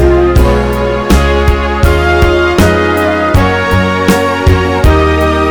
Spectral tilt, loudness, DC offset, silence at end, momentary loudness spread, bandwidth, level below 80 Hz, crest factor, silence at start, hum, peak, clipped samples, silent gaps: -6.5 dB/octave; -9 LUFS; 1%; 0 s; 2 LU; over 20 kHz; -14 dBFS; 8 dB; 0 s; none; 0 dBFS; 1%; none